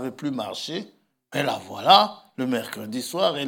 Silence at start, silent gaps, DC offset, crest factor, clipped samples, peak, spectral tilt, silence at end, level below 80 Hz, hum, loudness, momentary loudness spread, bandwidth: 0 s; none; under 0.1%; 24 dB; under 0.1%; 0 dBFS; -4 dB/octave; 0 s; -80 dBFS; none; -23 LUFS; 15 LU; 18 kHz